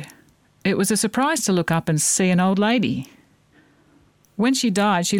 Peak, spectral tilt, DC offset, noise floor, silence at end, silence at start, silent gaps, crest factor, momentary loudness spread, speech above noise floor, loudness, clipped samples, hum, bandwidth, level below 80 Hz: -8 dBFS; -4 dB/octave; under 0.1%; -57 dBFS; 0 s; 0 s; none; 14 dB; 10 LU; 37 dB; -20 LUFS; under 0.1%; none; 17.5 kHz; -60 dBFS